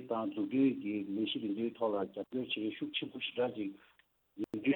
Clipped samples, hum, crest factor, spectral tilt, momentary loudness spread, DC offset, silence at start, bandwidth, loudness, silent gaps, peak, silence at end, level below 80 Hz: under 0.1%; none; 18 dB; -7.5 dB/octave; 9 LU; under 0.1%; 0 s; 4.2 kHz; -36 LUFS; none; -18 dBFS; 0 s; -78 dBFS